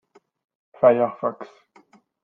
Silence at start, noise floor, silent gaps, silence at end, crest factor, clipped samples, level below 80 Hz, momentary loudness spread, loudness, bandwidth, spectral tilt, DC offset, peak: 0.8 s; -56 dBFS; none; 0.8 s; 20 dB; under 0.1%; -72 dBFS; 23 LU; -21 LUFS; 4.5 kHz; -9 dB/octave; under 0.1%; -4 dBFS